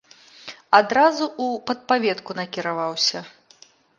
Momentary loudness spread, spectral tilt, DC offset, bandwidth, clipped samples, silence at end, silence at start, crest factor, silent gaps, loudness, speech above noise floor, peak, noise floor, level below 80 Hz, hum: 18 LU; -3 dB/octave; under 0.1%; 10.5 kHz; under 0.1%; 0.7 s; 0.45 s; 22 dB; none; -21 LUFS; 32 dB; 0 dBFS; -53 dBFS; -72 dBFS; none